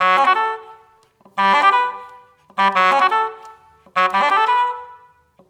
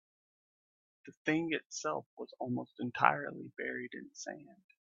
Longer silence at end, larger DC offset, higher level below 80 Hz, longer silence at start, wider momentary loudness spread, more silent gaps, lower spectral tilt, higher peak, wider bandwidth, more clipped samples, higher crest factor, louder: first, 0.55 s vs 0.4 s; neither; first, -72 dBFS vs -82 dBFS; second, 0 s vs 1.05 s; about the same, 16 LU vs 16 LU; second, none vs 1.17-1.25 s, 1.66-1.70 s, 2.06-2.17 s; second, -3 dB/octave vs -4.5 dB/octave; first, -2 dBFS vs -8 dBFS; first, 17 kHz vs 7.8 kHz; neither; second, 16 dB vs 32 dB; first, -16 LUFS vs -37 LUFS